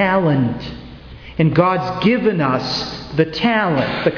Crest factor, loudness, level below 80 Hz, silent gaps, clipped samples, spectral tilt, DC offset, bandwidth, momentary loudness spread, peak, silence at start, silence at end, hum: 16 dB; -17 LUFS; -42 dBFS; none; under 0.1%; -7 dB/octave; under 0.1%; 5.4 kHz; 16 LU; -2 dBFS; 0 s; 0 s; none